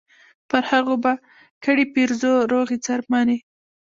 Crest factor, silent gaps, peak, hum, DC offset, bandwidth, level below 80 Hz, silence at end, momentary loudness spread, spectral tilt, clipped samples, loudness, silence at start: 18 dB; 1.51-1.61 s; -4 dBFS; none; under 0.1%; 7.6 kHz; -64 dBFS; 0.45 s; 6 LU; -3.5 dB/octave; under 0.1%; -21 LUFS; 0.55 s